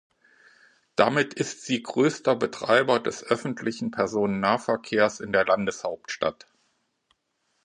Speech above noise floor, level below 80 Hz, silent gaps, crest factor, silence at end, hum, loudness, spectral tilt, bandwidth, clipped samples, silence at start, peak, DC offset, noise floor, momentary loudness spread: 49 dB; -64 dBFS; none; 24 dB; 1.35 s; none; -25 LUFS; -4.5 dB/octave; 11 kHz; under 0.1%; 1 s; -2 dBFS; under 0.1%; -74 dBFS; 8 LU